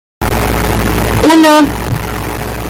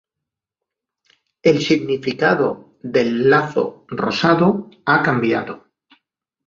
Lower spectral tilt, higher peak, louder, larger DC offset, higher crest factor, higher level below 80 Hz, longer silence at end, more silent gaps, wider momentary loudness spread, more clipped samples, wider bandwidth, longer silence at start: about the same, -5 dB/octave vs -6 dB/octave; about the same, 0 dBFS vs -2 dBFS; first, -11 LUFS vs -18 LUFS; neither; second, 12 dB vs 18 dB; first, -22 dBFS vs -58 dBFS; second, 0 s vs 0.9 s; neither; first, 12 LU vs 9 LU; neither; first, 17 kHz vs 7.4 kHz; second, 0.2 s vs 1.45 s